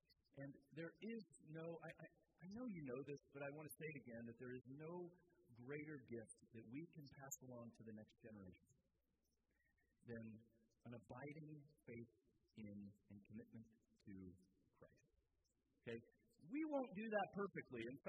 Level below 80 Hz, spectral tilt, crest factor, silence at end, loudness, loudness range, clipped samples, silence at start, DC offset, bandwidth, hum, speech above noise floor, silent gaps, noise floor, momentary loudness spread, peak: -86 dBFS; -6 dB/octave; 26 dB; 0 s; -55 LUFS; 11 LU; under 0.1%; 0.1 s; under 0.1%; 6.4 kHz; none; 34 dB; none; -89 dBFS; 15 LU; -30 dBFS